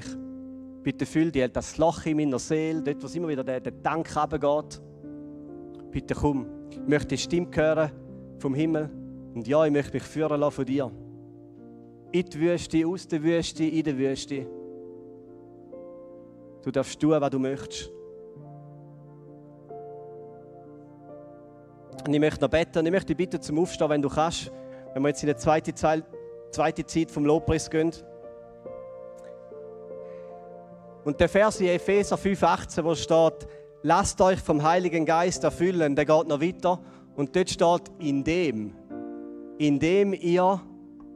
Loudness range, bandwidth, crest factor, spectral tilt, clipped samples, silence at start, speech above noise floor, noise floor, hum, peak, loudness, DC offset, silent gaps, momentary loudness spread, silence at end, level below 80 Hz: 9 LU; 12.5 kHz; 20 dB; -5.5 dB/octave; under 0.1%; 0 s; 24 dB; -49 dBFS; none; -6 dBFS; -26 LUFS; under 0.1%; none; 22 LU; 0 s; -50 dBFS